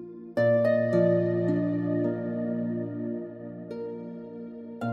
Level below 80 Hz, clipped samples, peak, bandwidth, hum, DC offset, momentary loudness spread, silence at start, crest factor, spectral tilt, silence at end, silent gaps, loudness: -70 dBFS; under 0.1%; -12 dBFS; 7.4 kHz; none; under 0.1%; 17 LU; 0 s; 16 dB; -10 dB/octave; 0 s; none; -27 LUFS